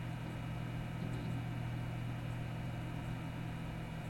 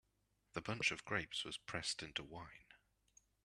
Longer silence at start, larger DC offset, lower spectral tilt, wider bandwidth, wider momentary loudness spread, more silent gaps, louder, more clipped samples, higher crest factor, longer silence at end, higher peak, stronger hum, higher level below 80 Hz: second, 0 s vs 0.55 s; neither; first, -7 dB/octave vs -2.5 dB/octave; first, 16.5 kHz vs 13 kHz; second, 2 LU vs 16 LU; neither; about the same, -42 LUFS vs -43 LUFS; neither; second, 12 dB vs 24 dB; second, 0 s vs 0.7 s; second, -30 dBFS vs -22 dBFS; neither; first, -54 dBFS vs -70 dBFS